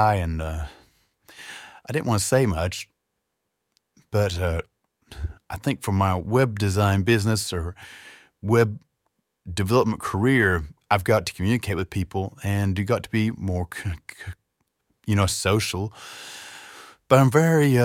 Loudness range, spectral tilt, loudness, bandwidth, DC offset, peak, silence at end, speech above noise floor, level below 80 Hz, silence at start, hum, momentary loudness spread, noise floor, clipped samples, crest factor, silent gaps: 5 LU; -5.5 dB/octave; -23 LUFS; 16.5 kHz; under 0.1%; -2 dBFS; 0 s; 56 dB; -42 dBFS; 0 s; none; 19 LU; -79 dBFS; under 0.1%; 22 dB; none